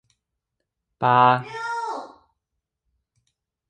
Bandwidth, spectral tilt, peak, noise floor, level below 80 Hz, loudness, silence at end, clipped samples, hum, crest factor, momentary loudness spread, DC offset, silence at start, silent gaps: 9.6 kHz; -6 dB/octave; -4 dBFS; -81 dBFS; -70 dBFS; -21 LUFS; 1.6 s; under 0.1%; none; 22 dB; 15 LU; under 0.1%; 1 s; none